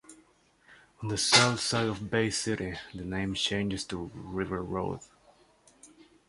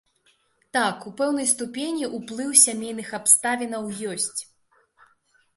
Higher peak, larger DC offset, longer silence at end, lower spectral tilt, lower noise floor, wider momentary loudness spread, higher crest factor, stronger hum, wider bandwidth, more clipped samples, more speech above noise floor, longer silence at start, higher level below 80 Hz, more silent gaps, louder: about the same, -4 dBFS vs -2 dBFS; neither; second, 0.4 s vs 1.15 s; first, -3 dB/octave vs -1.5 dB/octave; about the same, -64 dBFS vs -65 dBFS; about the same, 16 LU vs 15 LU; about the same, 28 dB vs 24 dB; neither; about the same, 11.5 kHz vs 12 kHz; neither; second, 34 dB vs 41 dB; second, 0.1 s vs 0.75 s; first, -54 dBFS vs -72 dBFS; neither; second, -29 LUFS vs -22 LUFS